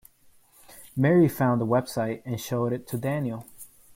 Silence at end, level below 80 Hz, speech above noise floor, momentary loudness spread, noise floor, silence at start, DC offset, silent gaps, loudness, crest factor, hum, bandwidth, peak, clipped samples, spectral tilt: 0.3 s; -60 dBFS; 33 dB; 14 LU; -58 dBFS; 0.7 s; under 0.1%; none; -26 LUFS; 16 dB; none; 16.5 kHz; -10 dBFS; under 0.1%; -7 dB/octave